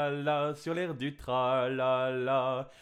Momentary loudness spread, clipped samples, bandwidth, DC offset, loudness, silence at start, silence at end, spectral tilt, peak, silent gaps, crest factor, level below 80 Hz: 5 LU; under 0.1%; 13 kHz; under 0.1%; -31 LUFS; 0 s; 0.1 s; -6.5 dB/octave; -18 dBFS; none; 14 dB; -62 dBFS